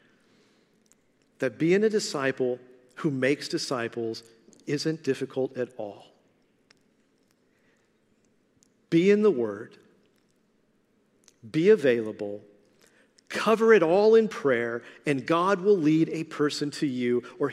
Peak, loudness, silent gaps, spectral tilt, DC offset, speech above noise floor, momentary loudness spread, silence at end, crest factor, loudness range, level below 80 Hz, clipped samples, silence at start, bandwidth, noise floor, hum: -6 dBFS; -25 LUFS; none; -5.5 dB/octave; under 0.1%; 43 dB; 15 LU; 0 s; 20 dB; 11 LU; -78 dBFS; under 0.1%; 1.4 s; 12.5 kHz; -68 dBFS; none